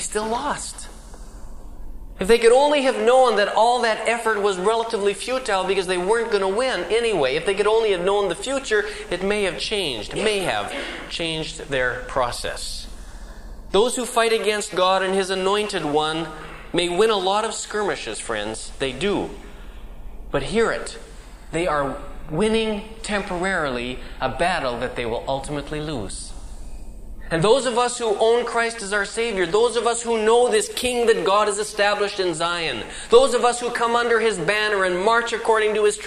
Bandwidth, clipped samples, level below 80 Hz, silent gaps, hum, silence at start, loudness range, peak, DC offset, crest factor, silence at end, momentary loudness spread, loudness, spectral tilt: 14.5 kHz; under 0.1%; -40 dBFS; none; none; 0 s; 7 LU; -2 dBFS; under 0.1%; 18 dB; 0 s; 12 LU; -21 LUFS; -3 dB/octave